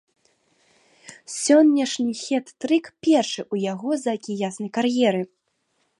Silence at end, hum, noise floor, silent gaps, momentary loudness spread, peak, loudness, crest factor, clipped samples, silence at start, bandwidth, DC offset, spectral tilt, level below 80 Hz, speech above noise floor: 0.75 s; none; -71 dBFS; none; 12 LU; -6 dBFS; -22 LUFS; 18 dB; under 0.1%; 1.1 s; 11.5 kHz; under 0.1%; -4.5 dB/octave; -74 dBFS; 49 dB